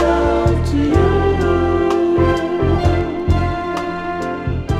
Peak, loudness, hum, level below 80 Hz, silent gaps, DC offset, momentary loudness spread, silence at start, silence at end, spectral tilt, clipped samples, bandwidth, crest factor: -4 dBFS; -17 LUFS; none; -26 dBFS; none; under 0.1%; 8 LU; 0 s; 0 s; -8 dB/octave; under 0.1%; 10.5 kHz; 12 dB